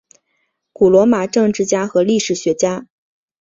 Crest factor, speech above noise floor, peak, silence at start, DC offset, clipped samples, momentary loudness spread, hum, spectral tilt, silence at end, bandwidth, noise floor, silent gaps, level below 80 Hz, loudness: 14 dB; 54 dB; -2 dBFS; 0.8 s; under 0.1%; under 0.1%; 7 LU; none; -5 dB/octave; 0.55 s; 7.8 kHz; -68 dBFS; none; -54 dBFS; -15 LUFS